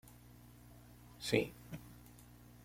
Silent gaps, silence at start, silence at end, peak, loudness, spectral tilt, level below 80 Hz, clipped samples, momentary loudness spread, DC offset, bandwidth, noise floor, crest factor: none; 0.05 s; 0 s; -16 dBFS; -40 LUFS; -5 dB/octave; -64 dBFS; under 0.1%; 24 LU; under 0.1%; 16.5 kHz; -59 dBFS; 28 dB